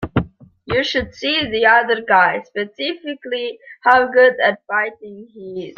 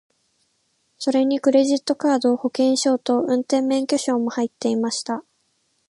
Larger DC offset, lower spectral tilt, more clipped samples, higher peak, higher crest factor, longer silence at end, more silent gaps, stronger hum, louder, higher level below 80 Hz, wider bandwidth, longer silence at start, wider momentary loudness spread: neither; first, -5 dB/octave vs -3.5 dB/octave; neither; first, -2 dBFS vs -6 dBFS; about the same, 16 dB vs 16 dB; second, 0.05 s vs 0.7 s; neither; neither; first, -17 LUFS vs -21 LUFS; first, -46 dBFS vs -74 dBFS; second, 7 kHz vs 11.5 kHz; second, 0 s vs 1 s; first, 17 LU vs 7 LU